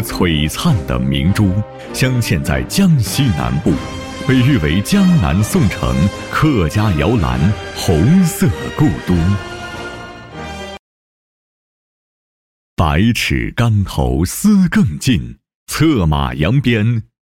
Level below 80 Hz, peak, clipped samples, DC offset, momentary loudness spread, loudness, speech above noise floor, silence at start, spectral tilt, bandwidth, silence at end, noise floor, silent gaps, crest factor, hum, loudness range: -28 dBFS; -2 dBFS; under 0.1%; 0.2%; 14 LU; -15 LUFS; over 76 dB; 0 s; -6 dB/octave; 17 kHz; 0.25 s; under -90 dBFS; 10.79-12.77 s, 15.55-15.66 s; 12 dB; none; 7 LU